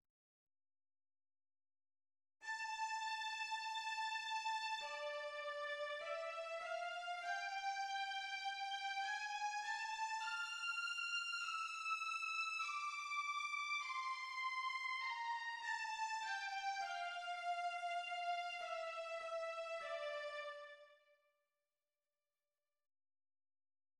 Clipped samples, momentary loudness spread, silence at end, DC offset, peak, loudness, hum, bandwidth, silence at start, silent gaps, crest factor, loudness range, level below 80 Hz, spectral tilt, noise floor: under 0.1%; 5 LU; 3.05 s; under 0.1%; -32 dBFS; -43 LUFS; none; 14 kHz; 2.4 s; none; 14 dB; 7 LU; under -90 dBFS; 3 dB/octave; under -90 dBFS